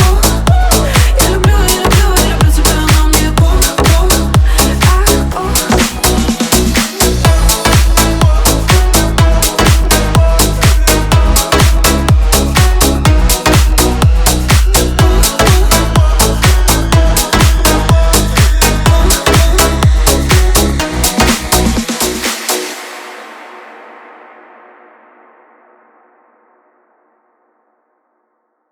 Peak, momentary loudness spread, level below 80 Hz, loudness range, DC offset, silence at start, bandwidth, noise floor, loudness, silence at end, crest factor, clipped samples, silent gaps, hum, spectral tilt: 0 dBFS; 4 LU; -12 dBFS; 4 LU; under 0.1%; 0 s; over 20 kHz; -63 dBFS; -10 LUFS; 4.95 s; 10 dB; 0.1%; none; none; -4 dB/octave